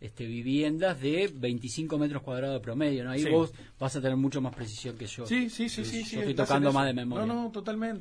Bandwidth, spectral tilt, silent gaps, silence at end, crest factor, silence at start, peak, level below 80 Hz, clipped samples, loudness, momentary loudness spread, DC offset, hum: 11 kHz; -6 dB/octave; none; 0 s; 18 dB; 0 s; -12 dBFS; -58 dBFS; under 0.1%; -30 LUFS; 10 LU; under 0.1%; none